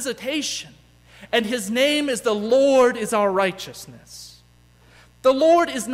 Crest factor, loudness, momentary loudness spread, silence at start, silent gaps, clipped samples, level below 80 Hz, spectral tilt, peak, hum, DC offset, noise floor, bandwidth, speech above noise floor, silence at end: 16 dB; -20 LUFS; 21 LU; 0 s; none; under 0.1%; -58 dBFS; -3 dB/octave; -6 dBFS; 60 Hz at -50 dBFS; under 0.1%; -53 dBFS; 16 kHz; 33 dB; 0 s